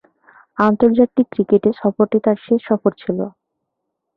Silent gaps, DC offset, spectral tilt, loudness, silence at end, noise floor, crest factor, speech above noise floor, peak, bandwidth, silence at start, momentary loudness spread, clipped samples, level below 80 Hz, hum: none; under 0.1%; -10 dB/octave; -17 LUFS; 0.9 s; -77 dBFS; 16 dB; 61 dB; -2 dBFS; 5 kHz; 0.6 s; 10 LU; under 0.1%; -56 dBFS; none